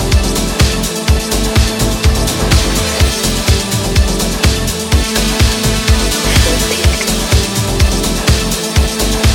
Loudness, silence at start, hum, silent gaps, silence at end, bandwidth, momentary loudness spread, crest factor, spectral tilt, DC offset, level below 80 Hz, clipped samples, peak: -13 LUFS; 0 s; none; none; 0 s; 17.5 kHz; 2 LU; 12 dB; -4 dB/octave; under 0.1%; -16 dBFS; under 0.1%; 0 dBFS